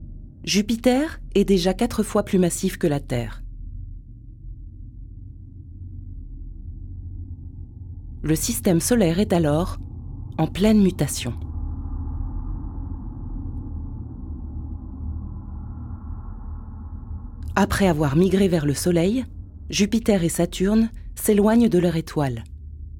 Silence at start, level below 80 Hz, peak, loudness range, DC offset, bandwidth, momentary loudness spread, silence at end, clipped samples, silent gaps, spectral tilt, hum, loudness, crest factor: 0 s; -36 dBFS; -4 dBFS; 18 LU; under 0.1%; 17.5 kHz; 21 LU; 0 s; under 0.1%; none; -5.5 dB/octave; none; -22 LUFS; 20 dB